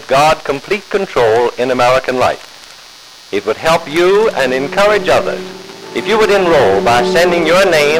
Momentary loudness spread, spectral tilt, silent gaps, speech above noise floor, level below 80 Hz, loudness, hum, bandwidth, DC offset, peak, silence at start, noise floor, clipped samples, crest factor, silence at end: 11 LU; -4 dB/octave; none; 25 dB; -40 dBFS; -12 LUFS; none; 16.5 kHz; under 0.1%; -4 dBFS; 0 s; -37 dBFS; under 0.1%; 8 dB; 0 s